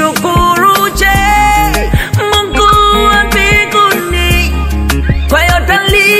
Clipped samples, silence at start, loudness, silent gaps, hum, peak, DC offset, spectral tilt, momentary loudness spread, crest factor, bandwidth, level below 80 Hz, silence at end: 0.3%; 0 s; -9 LUFS; none; none; 0 dBFS; 0.2%; -4 dB/octave; 6 LU; 8 dB; 16.5 kHz; -16 dBFS; 0 s